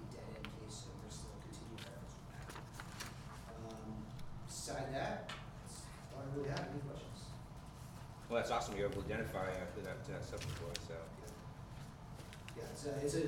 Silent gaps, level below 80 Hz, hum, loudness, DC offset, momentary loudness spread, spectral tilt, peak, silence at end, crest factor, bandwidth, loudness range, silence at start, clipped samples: none; -58 dBFS; none; -46 LUFS; under 0.1%; 12 LU; -5 dB/octave; -24 dBFS; 0 s; 22 dB; 17.5 kHz; 8 LU; 0 s; under 0.1%